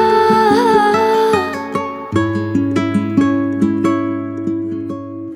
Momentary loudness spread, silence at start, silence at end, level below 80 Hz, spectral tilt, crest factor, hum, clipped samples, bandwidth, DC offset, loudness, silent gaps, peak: 10 LU; 0 s; 0 s; -54 dBFS; -6.5 dB/octave; 14 dB; none; under 0.1%; 15.5 kHz; under 0.1%; -15 LUFS; none; -2 dBFS